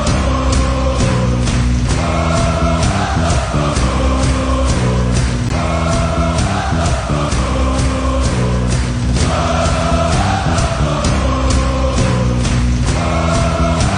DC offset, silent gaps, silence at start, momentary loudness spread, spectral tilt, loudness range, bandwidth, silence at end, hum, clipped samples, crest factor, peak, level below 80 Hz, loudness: under 0.1%; none; 0 s; 2 LU; -5.5 dB/octave; 1 LU; 10.5 kHz; 0 s; none; under 0.1%; 10 dB; -2 dBFS; -18 dBFS; -15 LUFS